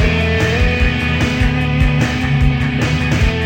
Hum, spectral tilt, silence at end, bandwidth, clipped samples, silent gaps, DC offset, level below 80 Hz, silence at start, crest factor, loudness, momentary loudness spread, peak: none; -6 dB/octave; 0 s; 16.5 kHz; under 0.1%; none; 0.7%; -20 dBFS; 0 s; 12 dB; -15 LUFS; 1 LU; -2 dBFS